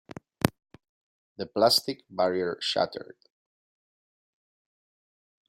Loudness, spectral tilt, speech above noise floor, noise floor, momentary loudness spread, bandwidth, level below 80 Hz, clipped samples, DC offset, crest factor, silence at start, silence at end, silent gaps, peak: -27 LUFS; -4 dB/octave; over 63 dB; under -90 dBFS; 17 LU; 16 kHz; -64 dBFS; under 0.1%; under 0.1%; 32 dB; 0.45 s; 2.45 s; 0.89-1.36 s; 0 dBFS